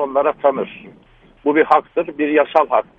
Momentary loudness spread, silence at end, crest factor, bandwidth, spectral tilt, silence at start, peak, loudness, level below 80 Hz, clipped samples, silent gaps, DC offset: 9 LU; 0.15 s; 18 dB; 5.6 kHz; -7 dB/octave; 0 s; 0 dBFS; -17 LUFS; -56 dBFS; under 0.1%; none; under 0.1%